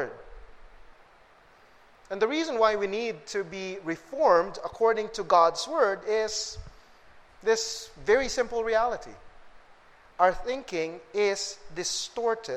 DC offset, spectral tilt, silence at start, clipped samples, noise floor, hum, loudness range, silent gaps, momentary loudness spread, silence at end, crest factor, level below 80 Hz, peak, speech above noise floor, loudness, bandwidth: under 0.1%; -2.5 dB/octave; 0 s; under 0.1%; -57 dBFS; none; 5 LU; none; 13 LU; 0 s; 22 dB; -52 dBFS; -8 dBFS; 30 dB; -27 LUFS; 13 kHz